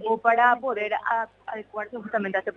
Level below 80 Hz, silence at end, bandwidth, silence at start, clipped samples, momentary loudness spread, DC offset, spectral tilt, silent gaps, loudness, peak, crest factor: -70 dBFS; 0.05 s; 6.6 kHz; 0 s; under 0.1%; 15 LU; under 0.1%; -6.5 dB/octave; none; -25 LUFS; -6 dBFS; 20 dB